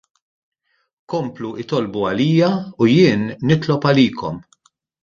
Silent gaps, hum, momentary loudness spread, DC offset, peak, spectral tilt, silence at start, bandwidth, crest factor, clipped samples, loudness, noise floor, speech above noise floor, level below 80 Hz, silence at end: none; none; 14 LU; under 0.1%; -2 dBFS; -7.5 dB/octave; 1.1 s; 7.4 kHz; 18 dB; under 0.1%; -18 LUFS; -59 dBFS; 42 dB; -54 dBFS; 0.6 s